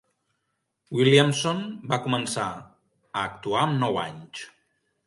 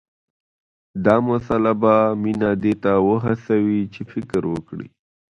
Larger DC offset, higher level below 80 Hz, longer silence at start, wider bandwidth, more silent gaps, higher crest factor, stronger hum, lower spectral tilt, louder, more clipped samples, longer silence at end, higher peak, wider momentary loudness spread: neither; second, -64 dBFS vs -50 dBFS; about the same, 0.9 s vs 0.95 s; first, 11.5 kHz vs 9 kHz; neither; about the same, 22 dB vs 20 dB; neither; second, -5 dB/octave vs -9 dB/octave; second, -25 LUFS vs -19 LUFS; neither; first, 0.6 s vs 0.45 s; second, -4 dBFS vs 0 dBFS; first, 20 LU vs 14 LU